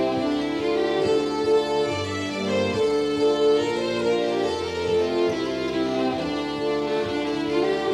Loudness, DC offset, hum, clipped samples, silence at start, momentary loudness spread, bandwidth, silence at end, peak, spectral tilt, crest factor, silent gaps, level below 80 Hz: -24 LUFS; under 0.1%; none; under 0.1%; 0 s; 5 LU; 11.5 kHz; 0 s; -12 dBFS; -5 dB/octave; 12 dB; none; -54 dBFS